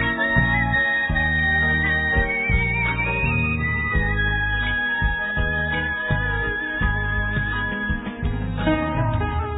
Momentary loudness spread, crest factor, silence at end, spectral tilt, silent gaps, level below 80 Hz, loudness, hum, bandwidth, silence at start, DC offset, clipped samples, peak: 6 LU; 18 dB; 0 s; -9.5 dB/octave; none; -28 dBFS; -21 LUFS; none; 4 kHz; 0 s; under 0.1%; under 0.1%; -4 dBFS